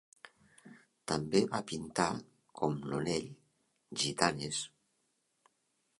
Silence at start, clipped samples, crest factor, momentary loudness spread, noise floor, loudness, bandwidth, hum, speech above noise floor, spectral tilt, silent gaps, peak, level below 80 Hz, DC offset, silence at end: 0.25 s; under 0.1%; 30 dB; 14 LU; -79 dBFS; -35 LUFS; 11.5 kHz; none; 45 dB; -4 dB/octave; none; -8 dBFS; -66 dBFS; under 0.1%; 1.35 s